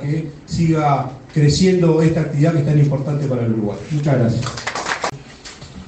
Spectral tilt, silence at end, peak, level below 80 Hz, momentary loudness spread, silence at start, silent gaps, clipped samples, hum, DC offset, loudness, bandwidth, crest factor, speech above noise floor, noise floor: -6.5 dB/octave; 0 s; -2 dBFS; -44 dBFS; 11 LU; 0 s; none; under 0.1%; none; under 0.1%; -18 LUFS; 8.8 kHz; 14 dB; 21 dB; -37 dBFS